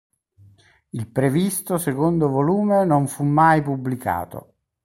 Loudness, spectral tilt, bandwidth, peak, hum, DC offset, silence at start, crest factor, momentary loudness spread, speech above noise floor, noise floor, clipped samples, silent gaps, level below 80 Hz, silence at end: -20 LUFS; -6.5 dB/octave; 16.5 kHz; -4 dBFS; none; under 0.1%; 0.95 s; 18 dB; 13 LU; 34 dB; -53 dBFS; under 0.1%; none; -54 dBFS; 0.45 s